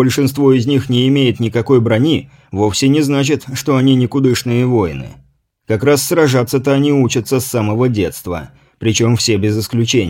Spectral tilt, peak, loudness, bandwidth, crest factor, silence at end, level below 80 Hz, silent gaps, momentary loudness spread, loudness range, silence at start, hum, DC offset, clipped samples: -5.5 dB/octave; 0 dBFS; -14 LUFS; 17 kHz; 14 dB; 0 s; -44 dBFS; none; 8 LU; 2 LU; 0 s; none; under 0.1%; under 0.1%